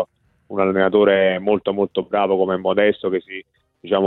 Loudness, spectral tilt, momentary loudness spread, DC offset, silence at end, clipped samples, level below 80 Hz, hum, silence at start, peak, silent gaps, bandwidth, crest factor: -19 LUFS; -9.5 dB/octave; 13 LU; under 0.1%; 0 s; under 0.1%; -60 dBFS; none; 0 s; -2 dBFS; none; 4.1 kHz; 16 dB